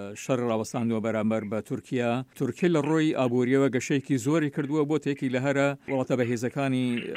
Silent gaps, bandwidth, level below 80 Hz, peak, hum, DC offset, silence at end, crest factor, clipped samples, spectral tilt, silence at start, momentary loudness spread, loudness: none; 15.5 kHz; -72 dBFS; -10 dBFS; none; under 0.1%; 0 s; 16 dB; under 0.1%; -6.5 dB/octave; 0 s; 6 LU; -27 LUFS